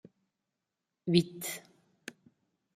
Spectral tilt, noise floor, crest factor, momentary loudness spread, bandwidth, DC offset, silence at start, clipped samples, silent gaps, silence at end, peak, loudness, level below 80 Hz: -5 dB/octave; -87 dBFS; 26 dB; 21 LU; 16 kHz; under 0.1%; 1.05 s; under 0.1%; none; 1.15 s; -10 dBFS; -32 LUFS; -72 dBFS